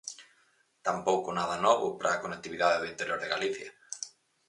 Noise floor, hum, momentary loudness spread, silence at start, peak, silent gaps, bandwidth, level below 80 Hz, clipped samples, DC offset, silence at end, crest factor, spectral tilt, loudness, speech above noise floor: -69 dBFS; none; 15 LU; 0.05 s; -10 dBFS; none; 11.5 kHz; -70 dBFS; under 0.1%; under 0.1%; 0.4 s; 22 dB; -3 dB/octave; -31 LUFS; 39 dB